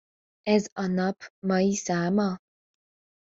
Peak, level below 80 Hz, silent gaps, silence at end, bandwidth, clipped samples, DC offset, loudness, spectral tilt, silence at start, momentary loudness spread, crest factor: -8 dBFS; -66 dBFS; 0.72-0.76 s, 1.30-1.42 s; 0.9 s; 8 kHz; under 0.1%; under 0.1%; -27 LUFS; -5.5 dB/octave; 0.45 s; 9 LU; 20 dB